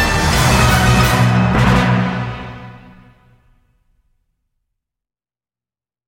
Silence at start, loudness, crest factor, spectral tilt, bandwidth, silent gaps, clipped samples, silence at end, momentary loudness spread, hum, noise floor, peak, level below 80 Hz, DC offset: 0 s; -13 LUFS; 16 dB; -5 dB/octave; 16.5 kHz; none; under 0.1%; 3.3 s; 16 LU; none; under -90 dBFS; 0 dBFS; -26 dBFS; under 0.1%